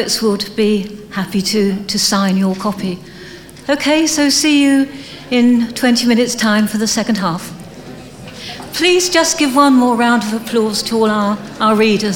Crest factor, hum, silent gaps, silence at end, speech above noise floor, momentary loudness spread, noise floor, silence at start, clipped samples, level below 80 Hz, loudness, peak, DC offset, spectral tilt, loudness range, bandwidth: 14 dB; none; none; 0 s; 20 dB; 18 LU; -34 dBFS; 0 s; under 0.1%; -48 dBFS; -14 LUFS; 0 dBFS; under 0.1%; -3.5 dB/octave; 3 LU; 18 kHz